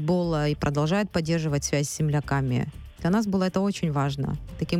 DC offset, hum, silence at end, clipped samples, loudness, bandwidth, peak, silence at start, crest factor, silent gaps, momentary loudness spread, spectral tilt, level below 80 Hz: under 0.1%; none; 0 s; under 0.1%; -26 LUFS; 14.5 kHz; -10 dBFS; 0 s; 14 dB; none; 6 LU; -6 dB/octave; -44 dBFS